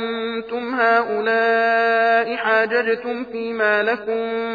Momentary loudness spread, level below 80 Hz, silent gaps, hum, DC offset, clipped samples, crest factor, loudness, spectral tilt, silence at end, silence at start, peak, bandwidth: 9 LU; -62 dBFS; none; none; under 0.1%; under 0.1%; 14 dB; -19 LUFS; -5.5 dB/octave; 0 s; 0 s; -6 dBFS; 5 kHz